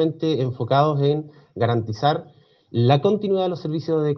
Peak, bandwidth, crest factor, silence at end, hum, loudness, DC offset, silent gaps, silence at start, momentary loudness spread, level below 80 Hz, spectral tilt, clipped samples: -2 dBFS; 6.4 kHz; 18 dB; 0 s; none; -21 LUFS; under 0.1%; none; 0 s; 9 LU; -64 dBFS; -8.5 dB/octave; under 0.1%